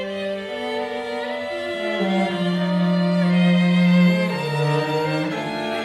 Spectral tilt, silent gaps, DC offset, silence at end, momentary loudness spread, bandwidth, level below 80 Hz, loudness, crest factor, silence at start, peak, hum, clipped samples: -7 dB/octave; none; under 0.1%; 0 s; 10 LU; 10 kHz; -64 dBFS; -21 LUFS; 14 dB; 0 s; -8 dBFS; none; under 0.1%